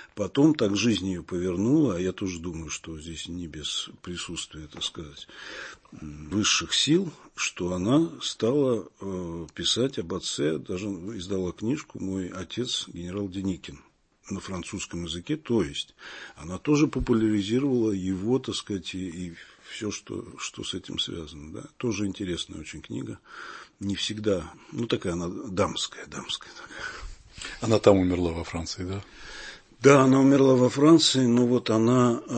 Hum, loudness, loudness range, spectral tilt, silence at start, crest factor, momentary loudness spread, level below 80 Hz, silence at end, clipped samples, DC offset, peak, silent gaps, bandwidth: none; -26 LUFS; 11 LU; -5 dB/octave; 0 s; 24 dB; 19 LU; -52 dBFS; 0 s; under 0.1%; under 0.1%; -2 dBFS; none; 8.8 kHz